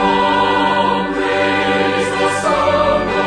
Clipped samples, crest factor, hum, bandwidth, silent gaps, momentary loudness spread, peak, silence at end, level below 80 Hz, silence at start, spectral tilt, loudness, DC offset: under 0.1%; 12 dB; none; 10.5 kHz; none; 3 LU; -4 dBFS; 0 s; -40 dBFS; 0 s; -4.5 dB/octave; -15 LUFS; under 0.1%